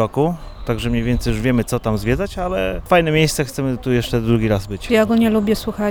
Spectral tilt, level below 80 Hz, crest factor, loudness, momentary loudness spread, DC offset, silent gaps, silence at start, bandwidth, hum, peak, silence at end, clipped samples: -6 dB/octave; -30 dBFS; 16 dB; -18 LUFS; 7 LU; under 0.1%; none; 0 s; 19.5 kHz; none; -2 dBFS; 0 s; under 0.1%